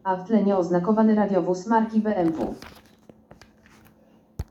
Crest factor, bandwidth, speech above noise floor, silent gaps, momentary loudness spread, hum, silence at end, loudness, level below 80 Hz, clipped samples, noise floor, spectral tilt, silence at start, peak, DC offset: 18 dB; 7.8 kHz; 35 dB; none; 14 LU; none; 0.05 s; -22 LUFS; -52 dBFS; under 0.1%; -57 dBFS; -8 dB/octave; 0.05 s; -6 dBFS; under 0.1%